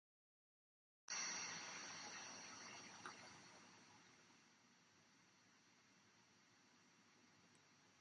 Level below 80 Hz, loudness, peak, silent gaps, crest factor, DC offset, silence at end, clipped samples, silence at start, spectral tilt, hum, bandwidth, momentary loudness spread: under -90 dBFS; -51 LUFS; -36 dBFS; none; 22 dB; under 0.1%; 0 s; under 0.1%; 1.1 s; 0 dB/octave; none; 10 kHz; 21 LU